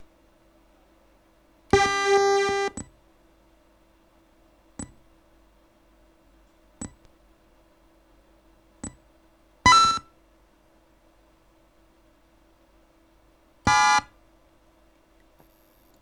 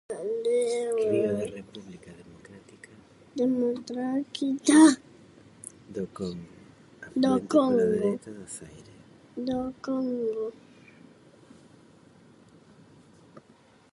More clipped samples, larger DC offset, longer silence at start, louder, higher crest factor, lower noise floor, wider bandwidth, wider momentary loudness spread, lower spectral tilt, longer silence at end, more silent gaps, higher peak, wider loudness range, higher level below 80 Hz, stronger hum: neither; neither; about the same, 0 s vs 0.1 s; first, -21 LUFS vs -26 LUFS; about the same, 26 dB vs 22 dB; about the same, -60 dBFS vs -58 dBFS; first, 13 kHz vs 11.5 kHz; about the same, 24 LU vs 23 LU; second, -2.5 dB/octave vs -5 dB/octave; first, 2 s vs 0.55 s; neither; about the same, -4 dBFS vs -6 dBFS; first, 22 LU vs 9 LU; first, -52 dBFS vs -66 dBFS; neither